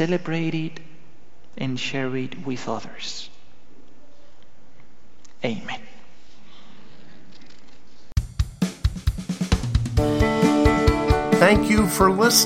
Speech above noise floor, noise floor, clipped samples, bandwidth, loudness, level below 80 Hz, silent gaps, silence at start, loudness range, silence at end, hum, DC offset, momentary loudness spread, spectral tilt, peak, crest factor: 33 dB; -55 dBFS; under 0.1%; 16 kHz; -22 LUFS; -32 dBFS; none; 0 s; 17 LU; 0 s; none; 3%; 15 LU; -4.5 dB/octave; 0 dBFS; 22 dB